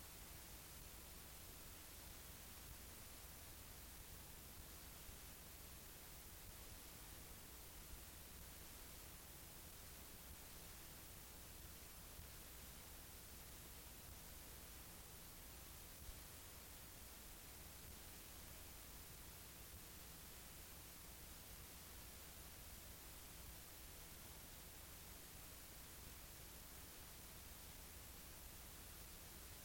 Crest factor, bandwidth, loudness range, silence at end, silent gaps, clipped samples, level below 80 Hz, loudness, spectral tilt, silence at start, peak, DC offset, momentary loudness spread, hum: 16 dB; 17 kHz; 0 LU; 0 s; none; under 0.1%; -64 dBFS; -57 LUFS; -2.5 dB/octave; 0 s; -42 dBFS; under 0.1%; 1 LU; none